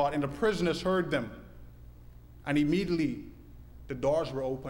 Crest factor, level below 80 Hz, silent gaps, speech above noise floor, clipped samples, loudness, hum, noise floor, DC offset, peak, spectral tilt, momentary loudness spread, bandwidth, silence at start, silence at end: 16 dB; -52 dBFS; none; 21 dB; under 0.1%; -30 LUFS; 60 Hz at -55 dBFS; -51 dBFS; under 0.1%; -16 dBFS; -6.5 dB/octave; 14 LU; 16.5 kHz; 0 s; 0 s